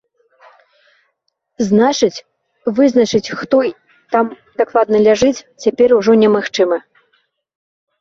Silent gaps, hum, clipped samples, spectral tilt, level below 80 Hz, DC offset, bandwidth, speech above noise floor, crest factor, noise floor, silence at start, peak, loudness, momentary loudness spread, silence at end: none; none; under 0.1%; -5 dB/octave; -54 dBFS; under 0.1%; 7.6 kHz; 56 dB; 16 dB; -69 dBFS; 1.6 s; 0 dBFS; -14 LUFS; 10 LU; 1.2 s